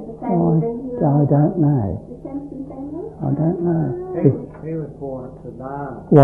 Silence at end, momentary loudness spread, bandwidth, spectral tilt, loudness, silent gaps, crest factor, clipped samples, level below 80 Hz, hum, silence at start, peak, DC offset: 0 s; 15 LU; 2.6 kHz; -12.5 dB/octave; -20 LUFS; none; 18 dB; under 0.1%; -46 dBFS; none; 0 s; 0 dBFS; under 0.1%